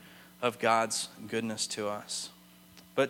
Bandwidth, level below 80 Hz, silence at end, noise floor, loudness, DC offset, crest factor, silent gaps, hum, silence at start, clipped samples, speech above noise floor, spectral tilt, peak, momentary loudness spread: 17.5 kHz; -76 dBFS; 0 s; -56 dBFS; -32 LUFS; under 0.1%; 22 dB; none; none; 0 s; under 0.1%; 24 dB; -2.5 dB/octave; -12 dBFS; 10 LU